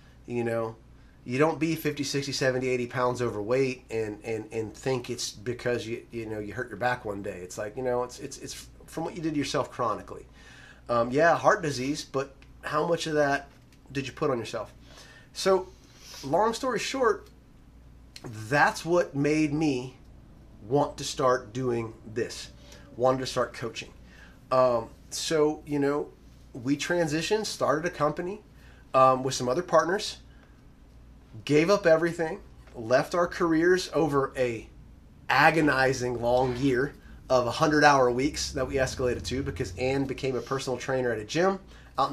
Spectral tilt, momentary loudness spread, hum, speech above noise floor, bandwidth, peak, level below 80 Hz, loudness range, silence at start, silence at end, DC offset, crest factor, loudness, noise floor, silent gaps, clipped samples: -5 dB/octave; 14 LU; none; 26 dB; 15 kHz; -4 dBFS; -52 dBFS; 7 LU; 0.3 s; 0 s; under 0.1%; 22 dB; -27 LUFS; -53 dBFS; none; under 0.1%